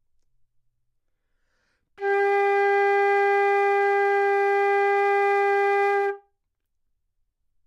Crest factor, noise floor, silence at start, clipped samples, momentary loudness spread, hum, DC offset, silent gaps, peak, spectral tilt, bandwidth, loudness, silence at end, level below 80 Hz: 12 dB; -75 dBFS; 2 s; under 0.1%; 4 LU; none; under 0.1%; none; -12 dBFS; -2.5 dB/octave; 7.6 kHz; -21 LUFS; 1.5 s; -78 dBFS